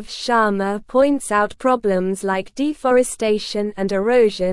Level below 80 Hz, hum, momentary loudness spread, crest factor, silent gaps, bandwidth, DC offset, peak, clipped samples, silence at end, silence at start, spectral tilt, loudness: -48 dBFS; none; 7 LU; 14 dB; none; 12 kHz; under 0.1%; -4 dBFS; under 0.1%; 0 s; 0 s; -4.5 dB/octave; -19 LUFS